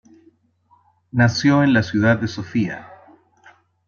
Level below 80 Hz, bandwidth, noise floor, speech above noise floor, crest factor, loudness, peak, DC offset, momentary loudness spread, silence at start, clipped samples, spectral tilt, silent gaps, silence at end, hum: -56 dBFS; 7 kHz; -59 dBFS; 42 dB; 18 dB; -18 LUFS; -2 dBFS; under 0.1%; 11 LU; 1.15 s; under 0.1%; -6.5 dB/octave; none; 0.95 s; none